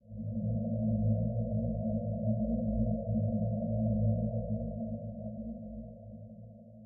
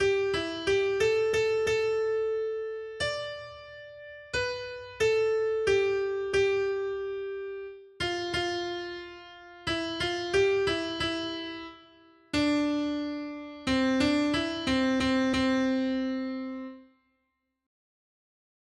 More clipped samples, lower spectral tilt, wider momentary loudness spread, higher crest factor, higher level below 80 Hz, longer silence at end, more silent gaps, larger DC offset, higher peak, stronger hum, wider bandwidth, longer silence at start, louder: neither; first, -10 dB/octave vs -4.5 dB/octave; about the same, 16 LU vs 15 LU; about the same, 14 dB vs 16 dB; first, -46 dBFS vs -54 dBFS; second, 0 s vs 1.8 s; neither; neither; second, -18 dBFS vs -14 dBFS; neither; second, 0.8 kHz vs 11.5 kHz; about the same, 0.05 s vs 0 s; second, -34 LUFS vs -29 LUFS